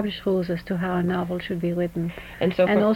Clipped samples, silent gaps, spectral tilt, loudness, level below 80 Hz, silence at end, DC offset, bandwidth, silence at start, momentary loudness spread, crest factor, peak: under 0.1%; none; -8 dB/octave; -25 LUFS; -48 dBFS; 0 s; under 0.1%; 16 kHz; 0 s; 7 LU; 16 dB; -8 dBFS